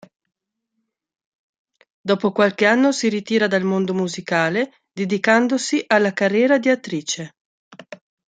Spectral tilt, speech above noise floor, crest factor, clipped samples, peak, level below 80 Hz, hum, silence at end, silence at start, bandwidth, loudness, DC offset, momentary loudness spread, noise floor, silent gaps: -4.5 dB/octave; 58 dB; 20 dB; under 0.1%; -2 dBFS; -70 dBFS; none; 0.35 s; 2.05 s; 9.4 kHz; -19 LUFS; under 0.1%; 10 LU; -76 dBFS; 7.41-7.71 s